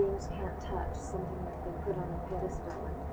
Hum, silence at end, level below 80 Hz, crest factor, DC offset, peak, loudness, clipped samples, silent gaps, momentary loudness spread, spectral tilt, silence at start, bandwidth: none; 0 s; -42 dBFS; 16 dB; under 0.1%; -20 dBFS; -38 LUFS; under 0.1%; none; 3 LU; -7.5 dB/octave; 0 s; over 20 kHz